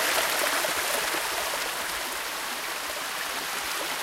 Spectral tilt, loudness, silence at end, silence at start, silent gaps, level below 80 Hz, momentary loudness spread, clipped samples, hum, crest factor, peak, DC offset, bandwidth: 0.5 dB/octave; -27 LUFS; 0 s; 0 s; none; -60 dBFS; 6 LU; under 0.1%; none; 18 dB; -10 dBFS; under 0.1%; 16 kHz